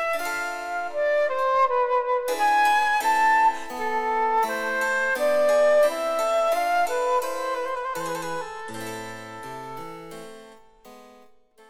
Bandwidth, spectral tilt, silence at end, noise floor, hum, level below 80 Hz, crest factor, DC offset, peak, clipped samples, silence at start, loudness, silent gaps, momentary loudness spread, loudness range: 17 kHz; -2.5 dB/octave; 0.6 s; -53 dBFS; none; -60 dBFS; 14 dB; under 0.1%; -10 dBFS; under 0.1%; 0 s; -23 LUFS; none; 17 LU; 12 LU